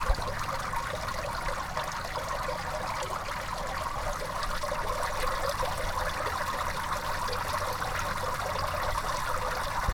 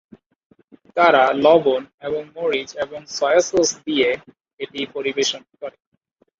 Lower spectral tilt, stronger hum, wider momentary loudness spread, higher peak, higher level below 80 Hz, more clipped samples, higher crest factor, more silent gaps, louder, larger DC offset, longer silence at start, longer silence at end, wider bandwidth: about the same, -3.5 dB/octave vs -2.5 dB/octave; neither; second, 3 LU vs 17 LU; second, -14 dBFS vs -2 dBFS; first, -40 dBFS vs -62 dBFS; neither; about the same, 18 dB vs 18 dB; second, none vs 1.94-1.98 s, 4.53-4.57 s; second, -32 LUFS vs -19 LUFS; neither; second, 0 s vs 0.95 s; second, 0 s vs 0.7 s; first, over 20 kHz vs 7.8 kHz